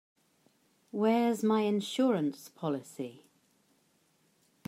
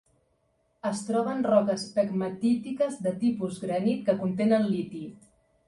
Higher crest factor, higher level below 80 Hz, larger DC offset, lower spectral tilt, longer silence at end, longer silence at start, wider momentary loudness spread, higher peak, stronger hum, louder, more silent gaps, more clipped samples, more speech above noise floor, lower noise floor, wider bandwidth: about the same, 16 dB vs 18 dB; second, -88 dBFS vs -68 dBFS; neither; about the same, -6 dB/octave vs -6.5 dB/octave; first, 1.55 s vs 0.55 s; about the same, 0.95 s vs 0.85 s; first, 15 LU vs 9 LU; second, -16 dBFS vs -10 dBFS; neither; second, -31 LUFS vs -27 LUFS; neither; neither; about the same, 41 dB vs 44 dB; about the same, -71 dBFS vs -71 dBFS; first, 15.5 kHz vs 11.5 kHz